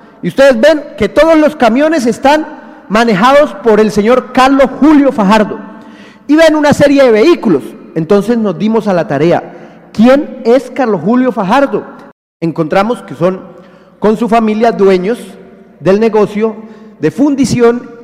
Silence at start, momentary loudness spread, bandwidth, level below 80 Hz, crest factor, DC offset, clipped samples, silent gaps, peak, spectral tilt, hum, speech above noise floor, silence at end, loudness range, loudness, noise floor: 0.25 s; 10 LU; 15.5 kHz; -40 dBFS; 10 dB; under 0.1%; under 0.1%; 12.12-12.40 s; 0 dBFS; -6 dB/octave; none; 25 dB; 0 s; 4 LU; -9 LUFS; -34 dBFS